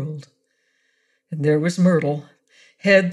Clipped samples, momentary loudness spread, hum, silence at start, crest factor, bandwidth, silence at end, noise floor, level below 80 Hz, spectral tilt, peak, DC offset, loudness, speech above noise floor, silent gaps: under 0.1%; 16 LU; none; 0 s; 18 dB; 11.5 kHz; 0 s; -68 dBFS; -68 dBFS; -6.5 dB/octave; -4 dBFS; under 0.1%; -20 LUFS; 51 dB; none